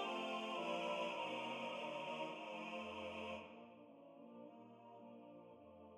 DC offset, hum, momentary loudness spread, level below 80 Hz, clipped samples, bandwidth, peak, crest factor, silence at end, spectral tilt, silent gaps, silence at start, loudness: under 0.1%; none; 18 LU; -86 dBFS; under 0.1%; 14.5 kHz; -32 dBFS; 16 dB; 0 s; -4 dB/octave; none; 0 s; -46 LUFS